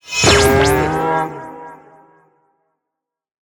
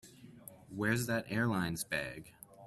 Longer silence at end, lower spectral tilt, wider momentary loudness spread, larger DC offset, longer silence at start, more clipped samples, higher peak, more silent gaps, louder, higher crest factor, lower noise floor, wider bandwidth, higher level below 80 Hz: first, 1.8 s vs 0 s; second, -3.5 dB/octave vs -5 dB/octave; about the same, 22 LU vs 20 LU; neither; about the same, 0.05 s vs 0.05 s; neither; first, 0 dBFS vs -18 dBFS; neither; first, -14 LUFS vs -35 LUFS; about the same, 18 dB vs 20 dB; first, -82 dBFS vs -55 dBFS; first, over 20 kHz vs 14.5 kHz; first, -34 dBFS vs -64 dBFS